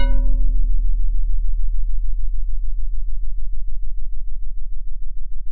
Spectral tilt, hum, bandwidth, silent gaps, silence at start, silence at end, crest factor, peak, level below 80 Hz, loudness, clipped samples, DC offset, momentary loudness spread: -9 dB/octave; none; 4 kHz; none; 0 s; 0 s; 8 dB; -4 dBFS; -20 dBFS; -28 LUFS; under 0.1%; under 0.1%; 11 LU